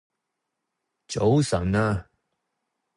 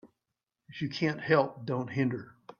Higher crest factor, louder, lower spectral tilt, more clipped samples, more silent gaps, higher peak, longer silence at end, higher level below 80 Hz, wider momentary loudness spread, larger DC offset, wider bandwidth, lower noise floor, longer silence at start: about the same, 18 dB vs 20 dB; first, -24 LUFS vs -31 LUFS; about the same, -6.5 dB/octave vs -7.5 dB/octave; neither; neither; about the same, -10 dBFS vs -12 dBFS; first, 0.95 s vs 0.05 s; first, -46 dBFS vs -72 dBFS; about the same, 10 LU vs 12 LU; neither; first, 11.5 kHz vs 7 kHz; second, -82 dBFS vs -87 dBFS; first, 1.1 s vs 0.05 s